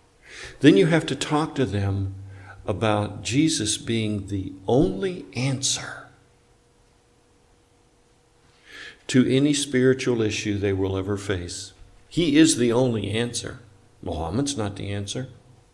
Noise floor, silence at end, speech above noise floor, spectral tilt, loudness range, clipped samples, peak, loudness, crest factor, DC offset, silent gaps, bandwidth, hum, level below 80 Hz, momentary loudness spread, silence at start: -59 dBFS; 0.4 s; 37 dB; -5 dB/octave; 6 LU; under 0.1%; -2 dBFS; -23 LUFS; 22 dB; under 0.1%; none; 12 kHz; none; -50 dBFS; 19 LU; 0.3 s